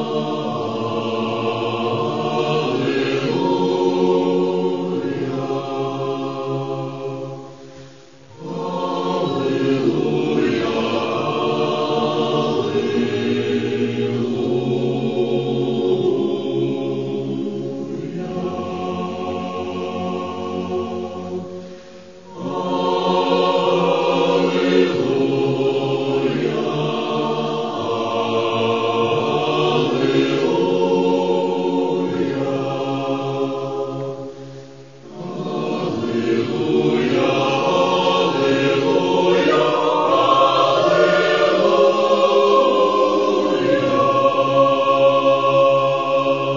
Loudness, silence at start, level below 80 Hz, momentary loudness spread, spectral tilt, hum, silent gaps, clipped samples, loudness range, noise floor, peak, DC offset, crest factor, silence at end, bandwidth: -19 LUFS; 0 s; -60 dBFS; 11 LU; -6 dB/octave; none; none; under 0.1%; 10 LU; -44 dBFS; -2 dBFS; 0.4%; 16 dB; 0 s; 7.4 kHz